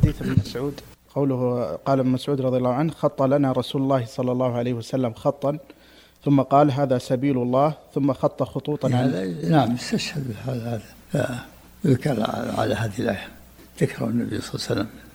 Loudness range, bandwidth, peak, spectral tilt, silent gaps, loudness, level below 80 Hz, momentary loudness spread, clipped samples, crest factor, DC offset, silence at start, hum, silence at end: 4 LU; 17 kHz; -2 dBFS; -7 dB/octave; none; -23 LUFS; -46 dBFS; 9 LU; under 0.1%; 20 dB; under 0.1%; 0 s; none; 0.05 s